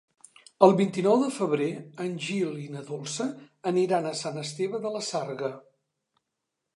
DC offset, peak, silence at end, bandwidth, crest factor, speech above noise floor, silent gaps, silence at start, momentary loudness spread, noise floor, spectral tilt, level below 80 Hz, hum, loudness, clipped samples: under 0.1%; -4 dBFS; 1.15 s; 11.5 kHz; 24 dB; 57 dB; none; 0.6 s; 14 LU; -84 dBFS; -5.5 dB/octave; -80 dBFS; none; -27 LUFS; under 0.1%